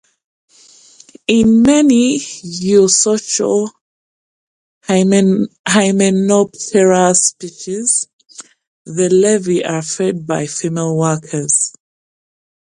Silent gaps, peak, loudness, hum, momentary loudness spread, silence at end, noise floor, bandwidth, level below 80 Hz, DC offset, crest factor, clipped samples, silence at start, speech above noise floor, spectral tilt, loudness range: 3.81-4.81 s, 5.59-5.64 s, 8.13-8.19 s, 8.67-8.85 s; 0 dBFS; -13 LUFS; none; 11 LU; 1 s; -45 dBFS; 11.5 kHz; -50 dBFS; under 0.1%; 14 dB; under 0.1%; 1.3 s; 32 dB; -4.5 dB/octave; 4 LU